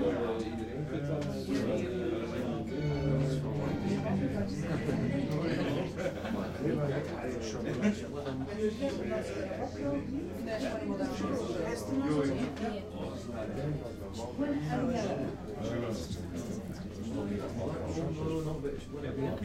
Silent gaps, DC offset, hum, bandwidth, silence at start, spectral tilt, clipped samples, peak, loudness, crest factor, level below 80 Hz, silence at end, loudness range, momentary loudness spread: none; under 0.1%; none; 15.5 kHz; 0 s; -7 dB/octave; under 0.1%; -18 dBFS; -35 LUFS; 16 dB; -52 dBFS; 0 s; 3 LU; 7 LU